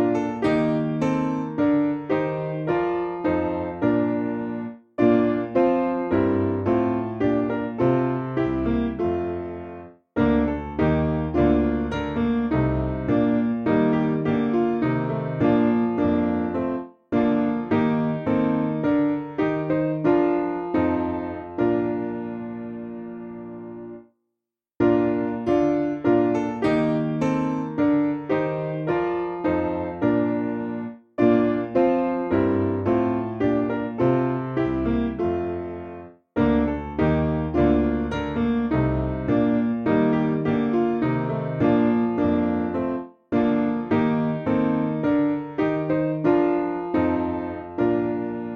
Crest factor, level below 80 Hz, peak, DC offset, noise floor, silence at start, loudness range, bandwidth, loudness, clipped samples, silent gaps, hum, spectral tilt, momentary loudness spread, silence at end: 16 dB; -42 dBFS; -6 dBFS; under 0.1%; -84 dBFS; 0 s; 3 LU; 6.8 kHz; -23 LUFS; under 0.1%; none; none; -9 dB/octave; 8 LU; 0 s